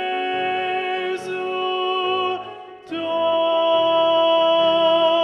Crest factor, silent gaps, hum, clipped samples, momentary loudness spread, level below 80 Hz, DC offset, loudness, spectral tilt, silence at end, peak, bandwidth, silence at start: 14 dB; none; none; under 0.1%; 10 LU; -72 dBFS; under 0.1%; -20 LUFS; -4.5 dB/octave; 0 s; -6 dBFS; 8.8 kHz; 0 s